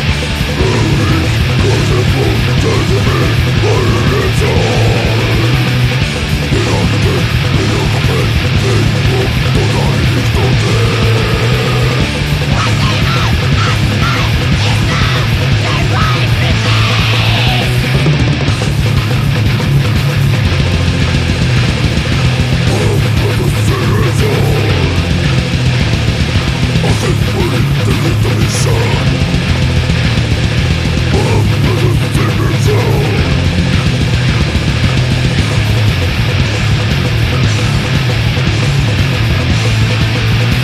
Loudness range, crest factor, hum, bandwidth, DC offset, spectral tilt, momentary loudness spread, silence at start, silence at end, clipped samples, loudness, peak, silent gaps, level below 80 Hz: 1 LU; 10 dB; none; 14 kHz; under 0.1%; -5.5 dB/octave; 2 LU; 0 s; 0 s; under 0.1%; -12 LUFS; 0 dBFS; none; -20 dBFS